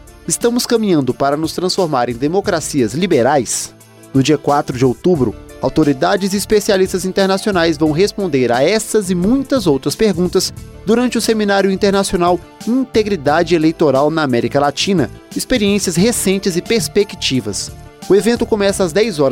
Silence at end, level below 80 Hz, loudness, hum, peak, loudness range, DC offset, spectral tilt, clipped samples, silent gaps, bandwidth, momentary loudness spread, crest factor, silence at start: 0 s; -40 dBFS; -15 LUFS; none; -2 dBFS; 1 LU; under 0.1%; -4.5 dB/octave; under 0.1%; none; 16.5 kHz; 5 LU; 12 dB; 0.1 s